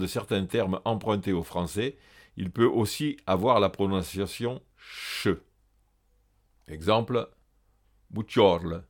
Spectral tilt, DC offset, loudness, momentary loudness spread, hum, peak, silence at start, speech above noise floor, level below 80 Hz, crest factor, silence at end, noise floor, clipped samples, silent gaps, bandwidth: -6 dB/octave; under 0.1%; -27 LUFS; 15 LU; none; -6 dBFS; 0 s; 40 dB; -54 dBFS; 22 dB; 0.05 s; -67 dBFS; under 0.1%; none; 19 kHz